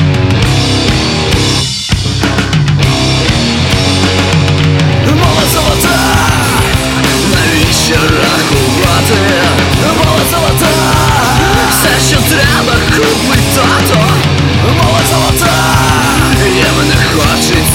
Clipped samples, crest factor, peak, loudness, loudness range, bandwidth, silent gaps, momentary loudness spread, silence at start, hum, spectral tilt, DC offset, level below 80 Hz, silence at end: under 0.1%; 8 dB; 0 dBFS; -8 LUFS; 2 LU; 17.5 kHz; none; 2 LU; 0 s; none; -4 dB/octave; under 0.1%; -22 dBFS; 0 s